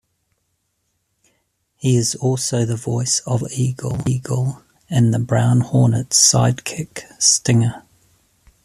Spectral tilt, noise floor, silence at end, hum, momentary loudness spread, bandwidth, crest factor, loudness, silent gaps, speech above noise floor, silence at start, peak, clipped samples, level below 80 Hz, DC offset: -4.5 dB/octave; -70 dBFS; 0.85 s; none; 12 LU; 13 kHz; 18 dB; -17 LUFS; none; 53 dB; 1.8 s; 0 dBFS; under 0.1%; -50 dBFS; under 0.1%